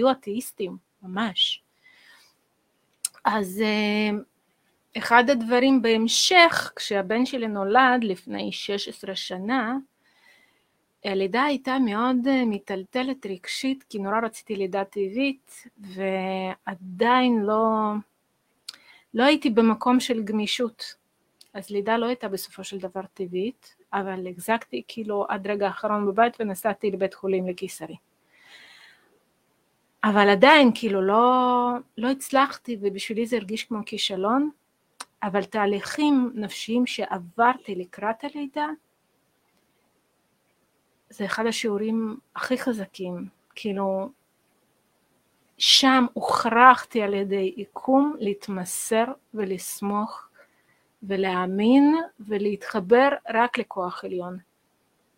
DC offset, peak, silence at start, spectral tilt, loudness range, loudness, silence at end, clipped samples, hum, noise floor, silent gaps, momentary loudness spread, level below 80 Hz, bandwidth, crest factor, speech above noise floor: under 0.1%; 0 dBFS; 0 s; -4 dB/octave; 10 LU; -23 LUFS; 0.8 s; under 0.1%; none; -70 dBFS; none; 15 LU; -70 dBFS; 16 kHz; 24 dB; 47 dB